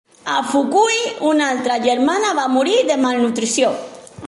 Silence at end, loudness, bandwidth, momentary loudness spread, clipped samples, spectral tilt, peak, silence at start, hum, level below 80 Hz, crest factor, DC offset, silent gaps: 0 s; -17 LUFS; 11.5 kHz; 5 LU; under 0.1%; -2.5 dB/octave; -4 dBFS; 0.25 s; none; -62 dBFS; 14 dB; under 0.1%; none